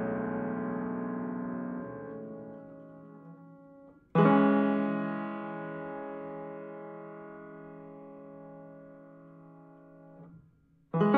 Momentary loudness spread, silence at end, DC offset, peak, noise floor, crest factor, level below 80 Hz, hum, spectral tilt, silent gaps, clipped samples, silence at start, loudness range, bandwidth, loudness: 27 LU; 0 s; under 0.1%; -12 dBFS; -64 dBFS; 22 dB; -72 dBFS; none; -10.5 dB/octave; none; under 0.1%; 0 s; 19 LU; 4.3 kHz; -32 LUFS